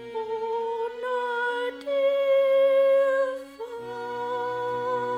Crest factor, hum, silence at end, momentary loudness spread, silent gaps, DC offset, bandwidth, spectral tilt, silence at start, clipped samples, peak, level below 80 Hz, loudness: 12 dB; 60 Hz at -70 dBFS; 0 s; 14 LU; none; under 0.1%; 9.2 kHz; -4.5 dB/octave; 0 s; under 0.1%; -14 dBFS; -70 dBFS; -25 LUFS